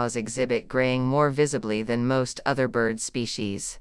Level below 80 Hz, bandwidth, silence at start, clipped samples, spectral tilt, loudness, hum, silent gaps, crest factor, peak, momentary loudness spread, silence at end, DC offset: -54 dBFS; 12 kHz; 0 s; under 0.1%; -5 dB/octave; -25 LUFS; none; none; 16 dB; -10 dBFS; 6 LU; 0 s; under 0.1%